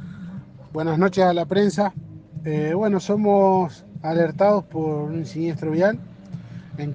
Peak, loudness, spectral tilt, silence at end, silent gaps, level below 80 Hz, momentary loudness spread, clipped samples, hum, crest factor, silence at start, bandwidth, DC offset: -4 dBFS; -21 LUFS; -7.5 dB/octave; 0 s; none; -60 dBFS; 19 LU; under 0.1%; none; 18 dB; 0 s; 9.2 kHz; under 0.1%